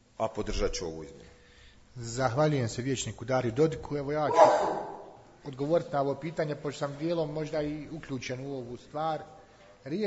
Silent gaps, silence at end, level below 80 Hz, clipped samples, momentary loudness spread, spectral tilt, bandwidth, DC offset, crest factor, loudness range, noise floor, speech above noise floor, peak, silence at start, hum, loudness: none; 0 s; -48 dBFS; under 0.1%; 17 LU; -5.5 dB/octave; 8 kHz; under 0.1%; 24 dB; 7 LU; -56 dBFS; 26 dB; -6 dBFS; 0.2 s; none; -30 LUFS